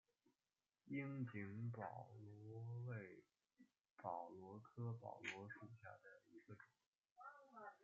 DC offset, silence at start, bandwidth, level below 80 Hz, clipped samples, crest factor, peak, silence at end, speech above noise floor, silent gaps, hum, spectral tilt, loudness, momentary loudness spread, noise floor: under 0.1%; 0.25 s; 7.2 kHz; under -90 dBFS; under 0.1%; 22 dB; -34 dBFS; 0 s; over 38 dB; 3.91-3.96 s, 6.87-6.92 s, 7.12-7.16 s; none; -6.5 dB/octave; -54 LUFS; 14 LU; under -90 dBFS